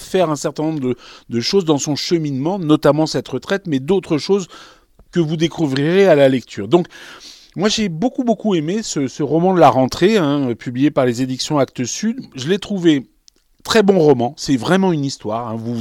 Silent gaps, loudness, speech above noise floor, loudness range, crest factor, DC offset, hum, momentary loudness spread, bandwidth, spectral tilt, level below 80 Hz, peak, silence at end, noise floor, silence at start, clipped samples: none; -17 LUFS; 38 dB; 3 LU; 16 dB; under 0.1%; none; 11 LU; 16.5 kHz; -5.5 dB/octave; -52 dBFS; 0 dBFS; 0 s; -54 dBFS; 0 s; under 0.1%